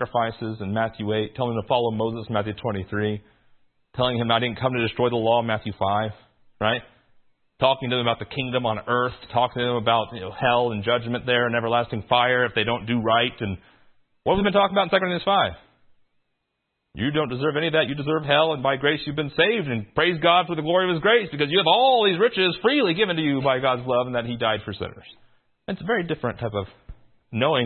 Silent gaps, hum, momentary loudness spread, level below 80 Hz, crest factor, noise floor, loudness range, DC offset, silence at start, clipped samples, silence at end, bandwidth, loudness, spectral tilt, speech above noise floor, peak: none; none; 9 LU; -54 dBFS; 20 dB; -77 dBFS; 6 LU; under 0.1%; 0 s; under 0.1%; 0 s; 4.4 kHz; -23 LUFS; -10 dB/octave; 55 dB; -2 dBFS